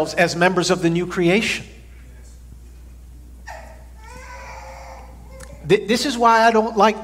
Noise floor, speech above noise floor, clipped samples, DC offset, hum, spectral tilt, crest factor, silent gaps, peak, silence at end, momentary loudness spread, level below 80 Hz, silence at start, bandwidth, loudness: -41 dBFS; 23 dB; under 0.1%; under 0.1%; none; -4.5 dB/octave; 20 dB; none; 0 dBFS; 0 s; 25 LU; -42 dBFS; 0 s; 16 kHz; -17 LUFS